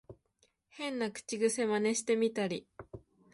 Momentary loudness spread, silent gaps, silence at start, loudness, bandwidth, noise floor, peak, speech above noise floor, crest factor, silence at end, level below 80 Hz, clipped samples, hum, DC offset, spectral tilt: 21 LU; none; 0.1 s; -33 LUFS; 11.5 kHz; -74 dBFS; -18 dBFS; 42 dB; 16 dB; 0.35 s; -70 dBFS; under 0.1%; none; under 0.1%; -3.5 dB/octave